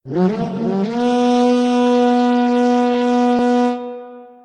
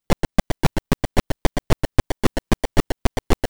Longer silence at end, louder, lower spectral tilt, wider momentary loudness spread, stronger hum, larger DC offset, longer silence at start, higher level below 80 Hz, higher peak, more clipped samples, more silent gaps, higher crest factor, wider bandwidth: first, 0.2 s vs 0 s; first, -16 LUFS vs -24 LUFS; about the same, -6.5 dB/octave vs -5.5 dB/octave; first, 6 LU vs 3 LU; neither; second, under 0.1% vs 2%; about the same, 0.05 s vs 0 s; second, -58 dBFS vs -26 dBFS; about the same, -4 dBFS vs -4 dBFS; neither; neither; second, 12 dB vs 18 dB; second, 9.4 kHz vs over 20 kHz